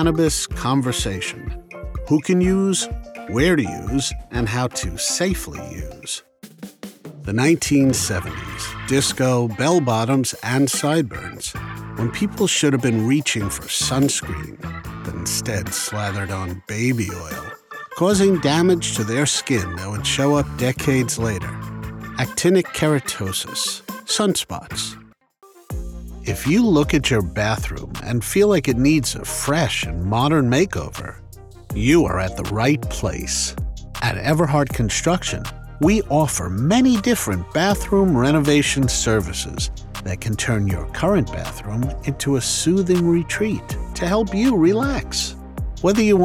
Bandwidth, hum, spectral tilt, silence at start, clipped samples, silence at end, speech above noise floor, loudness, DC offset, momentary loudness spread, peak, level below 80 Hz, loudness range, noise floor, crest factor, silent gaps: 20 kHz; none; -4.5 dB/octave; 0 s; under 0.1%; 0 s; 32 dB; -20 LUFS; under 0.1%; 14 LU; -4 dBFS; -36 dBFS; 4 LU; -51 dBFS; 16 dB; none